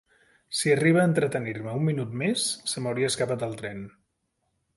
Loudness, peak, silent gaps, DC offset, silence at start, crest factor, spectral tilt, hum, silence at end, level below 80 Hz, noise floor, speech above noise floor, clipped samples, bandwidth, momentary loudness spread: -26 LUFS; -8 dBFS; none; under 0.1%; 0.5 s; 18 dB; -4.5 dB/octave; none; 0.9 s; -64 dBFS; -76 dBFS; 50 dB; under 0.1%; 12 kHz; 13 LU